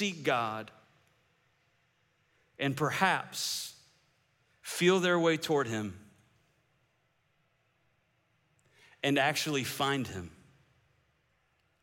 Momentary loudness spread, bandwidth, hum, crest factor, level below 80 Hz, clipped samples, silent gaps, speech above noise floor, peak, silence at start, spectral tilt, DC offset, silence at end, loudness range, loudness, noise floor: 16 LU; 17 kHz; none; 22 dB; -76 dBFS; under 0.1%; none; 44 dB; -12 dBFS; 0 s; -4 dB/octave; under 0.1%; 1.5 s; 6 LU; -30 LUFS; -74 dBFS